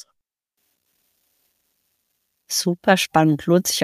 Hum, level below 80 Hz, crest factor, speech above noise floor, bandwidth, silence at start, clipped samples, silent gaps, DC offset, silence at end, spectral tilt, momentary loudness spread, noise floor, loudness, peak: none; -60 dBFS; 22 dB; 59 dB; 15.5 kHz; 2.5 s; under 0.1%; none; under 0.1%; 0 s; -4 dB/octave; 6 LU; -77 dBFS; -19 LUFS; -2 dBFS